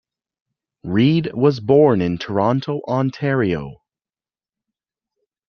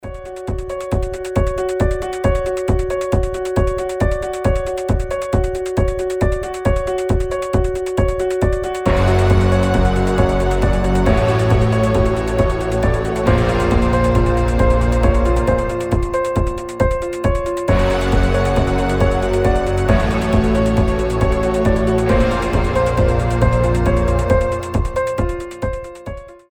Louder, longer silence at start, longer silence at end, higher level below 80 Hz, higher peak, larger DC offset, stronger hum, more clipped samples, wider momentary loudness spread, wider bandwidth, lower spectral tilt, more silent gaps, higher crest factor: about the same, -18 LUFS vs -17 LUFS; first, 0.85 s vs 0.05 s; first, 1.75 s vs 0.15 s; second, -54 dBFS vs -22 dBFS; about the same, -2 dBFS vs 0 dBFS; neither; neither; neither; first, 9 LU vs 5 LU; second, 6.6 kHz vs 17.5 kHz; first, -8.5 dB/octave vs -7 dB/octave; neither; about the same, 18 dB vs 16 dB